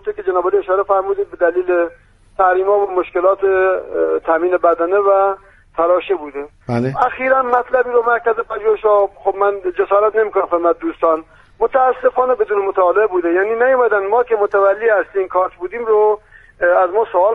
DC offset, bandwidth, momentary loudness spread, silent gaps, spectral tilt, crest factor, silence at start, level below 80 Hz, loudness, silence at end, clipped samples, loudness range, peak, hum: under 0.1%; 5.6 kHz; 6 LU; none; -8 dB/octave; 14 dB; 0.05 s; -50 dBFS; -16 LUFS; 0 s; under 0.1%; 2 LU; 0 dBFS; none